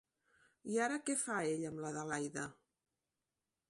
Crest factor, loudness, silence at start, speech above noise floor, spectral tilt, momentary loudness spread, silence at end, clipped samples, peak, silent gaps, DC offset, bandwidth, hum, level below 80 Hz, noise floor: 18 dB; -39 LUFS; 0.65 s; over 51 dB; -4 dB/octave; 9 LU; 1.15 s; under 0.1%; -24 dBFS; none; under 0.1%; 11.5 kHz; none; -80 dBFS; under -90 dBFS